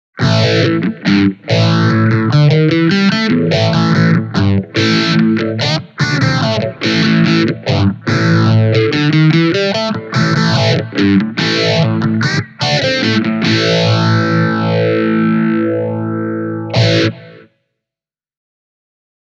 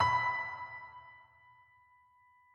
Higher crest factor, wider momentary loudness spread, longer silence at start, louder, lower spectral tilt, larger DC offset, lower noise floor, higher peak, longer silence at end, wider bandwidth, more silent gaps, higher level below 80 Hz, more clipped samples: second, 12 dB vs 20 dB; second, 5 LU vs 25 LU; first, 0.15 s vs 0 s; first, -13 LUFS vs -35 LUFS; first, -6.5 dB/octave vs -3.5 dB/octave; neither; first, -88 dBFS vs -66 dBFS; first, 0 dBFS vs -18 dBFS; first, 2 s vs 1.3 s; second, 7.6 kHz vs 10 kHz; neither; first, -50 dBFS vs -70 dBFS; neither